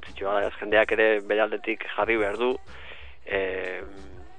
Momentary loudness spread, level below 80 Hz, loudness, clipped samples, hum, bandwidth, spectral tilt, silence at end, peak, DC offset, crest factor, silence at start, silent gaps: 21 LU; -52 dBFS; -25 LUFS; under 0.1%; none; 9.4 kHz; -5.5 dB/octave; 0.1 s; -6 dBFS; 0.9%; 22 dB; 0 s; none